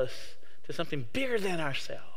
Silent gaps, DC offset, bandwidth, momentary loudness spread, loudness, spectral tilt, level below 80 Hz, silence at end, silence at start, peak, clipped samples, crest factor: none; 3%; 16.5 kHz; 17 LU; -34 LUFS; -4.5 dB/octave; -64 dBFS; 0 s; 0 s; -16 dBFS; under 0.1%; 18 dB